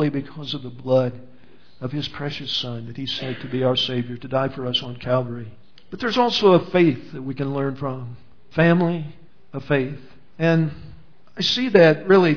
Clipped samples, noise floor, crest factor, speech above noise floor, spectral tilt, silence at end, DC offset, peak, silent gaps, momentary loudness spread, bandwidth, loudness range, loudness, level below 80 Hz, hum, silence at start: under 0.1%; -52 dBFS; 20 dB; 31 dB; -6.5 dB/octave; 0 s; 1%; -2 dBFS; none; 16 LU; 5.4 kHz; 5 LU; -21 LUFS; -56 dBFS; none; 0 s